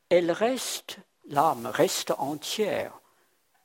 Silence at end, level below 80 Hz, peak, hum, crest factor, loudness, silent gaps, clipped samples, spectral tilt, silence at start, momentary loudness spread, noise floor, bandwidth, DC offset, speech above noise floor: 0.65 s; -72 dBFS; -8 dBFS; none; 20 dB; -27 LUFS; none; under 0.1%; -3.5 dB/octave; 0.1 s; 11 LU; -68 dBFS; 16.5 kHz; under 0.1%; 41 dB